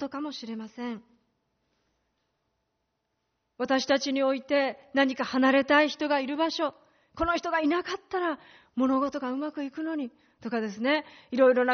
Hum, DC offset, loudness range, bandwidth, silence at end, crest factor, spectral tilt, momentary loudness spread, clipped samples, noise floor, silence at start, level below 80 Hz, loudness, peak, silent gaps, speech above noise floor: none; under 0.1%; 11 LU; 6.6 kHz; 0 s; 18 dB; -1.5 dB/octave; 14 LU; under 0.1%; -79 dBFS; 0 s; -58 dBFS; -28 LUFS; -10 dBFS; none; 52 dB